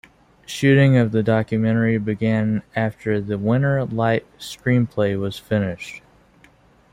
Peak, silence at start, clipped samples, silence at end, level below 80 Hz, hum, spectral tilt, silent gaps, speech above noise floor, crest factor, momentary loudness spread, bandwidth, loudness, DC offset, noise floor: -4 dBFS; 0.5 s; under 0.1%; 0.95 s; -54 dBFS; none; -7.5 dB/octave; none; 34 dB; 16 dB; 11 LU; 15 kHz; -20 LUFS; under 0.1%; -53 dBFS